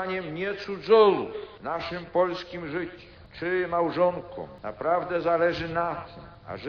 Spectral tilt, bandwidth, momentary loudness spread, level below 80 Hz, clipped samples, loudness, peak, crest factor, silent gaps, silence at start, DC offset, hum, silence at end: -4 dB/octave; 6.6 kHz; 16 LU; -56 dBFS; under 0.1%; -26 LUFS; -8 dBFS; 20 dB; none; 0 s; under 0.1%; none; 0 s